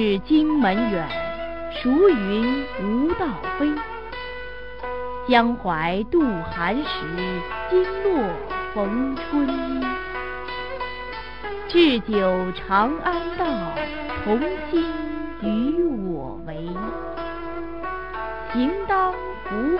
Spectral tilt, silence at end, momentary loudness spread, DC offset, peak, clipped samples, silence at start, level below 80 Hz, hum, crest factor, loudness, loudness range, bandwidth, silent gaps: -8 dB/octave; 0 s; 13 LU; 1%; -4 dBFS; under 0.1%; 0 s; -42 dBFS; none; 20 dB; -24 LUFS; 5 LU; 5.6 kHz; none